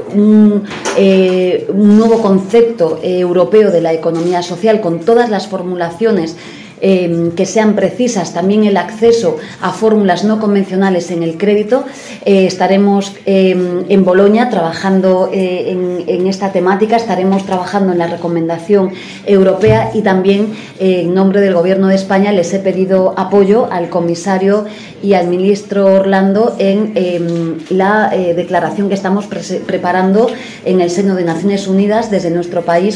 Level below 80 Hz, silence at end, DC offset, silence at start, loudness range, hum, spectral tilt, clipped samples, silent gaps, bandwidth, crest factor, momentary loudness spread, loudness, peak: -50 dBFS; 0 s; under 0.1%; 0 s; 3 LU; none; -6.5 dB/octave; under 0.1%; none; 10.5 kHz; 10 dB; 7 LU; -12 LUFS; 0 dBFS